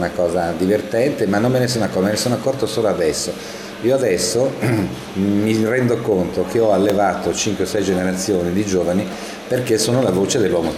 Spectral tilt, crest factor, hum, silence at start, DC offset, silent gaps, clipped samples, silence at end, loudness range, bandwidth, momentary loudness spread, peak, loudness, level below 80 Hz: -5 dB/octave; 14 dB; none; 0 s; under 0.1%; none; under 0.1%; 0 s; 1 LU; 16 kHz; 6 LU; -4 dBFS; -18 LUFS; -48 dBFS